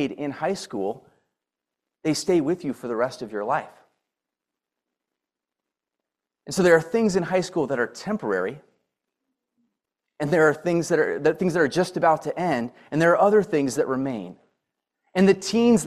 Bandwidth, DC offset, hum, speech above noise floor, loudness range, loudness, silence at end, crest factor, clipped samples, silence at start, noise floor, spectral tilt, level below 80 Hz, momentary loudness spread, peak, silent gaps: 14 kHz; under 0.1%; none; 64 dB; 9 LU; -23 LUFS; 0 s; 20 dB; under 0.1%; 0 s; -87 dBFS; -5.5 dB/octave; -62 dBFS; 11 LU; -6 dBFS; none